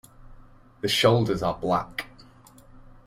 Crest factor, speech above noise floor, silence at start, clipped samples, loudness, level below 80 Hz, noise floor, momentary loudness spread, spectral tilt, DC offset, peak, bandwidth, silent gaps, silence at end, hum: 22 dB; 28 dB; 0.25 s; under 0.1%; -24 LUFS; -50 dBFS; -51 dBFS; 16 LU; -5 dB/octave; under 0.1%; -6 dBFS; 16 kHz; none; 1 s; none